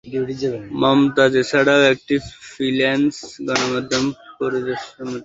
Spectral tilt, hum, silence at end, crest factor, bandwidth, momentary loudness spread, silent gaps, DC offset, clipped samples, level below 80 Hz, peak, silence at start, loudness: -4.5 dB/octave; none; 0 s; 18 dB; 8 kHz; 12 LU; none; under 0.1%; under 0.1%; -54 dBFS; -2 dBFS; 0.05 s; -19 LUFS